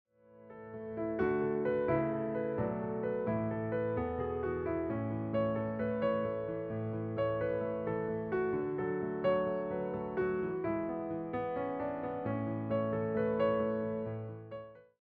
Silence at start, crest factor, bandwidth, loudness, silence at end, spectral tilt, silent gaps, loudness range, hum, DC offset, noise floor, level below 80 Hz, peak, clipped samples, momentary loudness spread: 0.3 s; 16 dB; 4.9 kHz; -35 LUFS; 0.25 s; -7.5 dB/octave; none; 1 LU; none; under 0.1%; -56 dBFS; -62 dBFS; -20 dBFS; under 0.1%; 6 LU